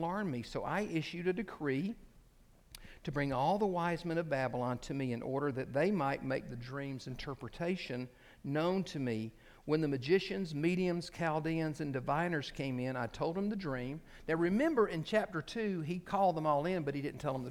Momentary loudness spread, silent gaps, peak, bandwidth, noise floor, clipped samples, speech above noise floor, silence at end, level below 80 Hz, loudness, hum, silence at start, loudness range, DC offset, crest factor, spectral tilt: 11 LU; none; -18 dBFS; 15.5 kHz; -63 dBFS; under 0.1%; 28 dB; 0 s; -60 dBFS; -36 LUFS; none; 0 s; 4 LU; under 0.1%; 18 dB; -7 dB/octave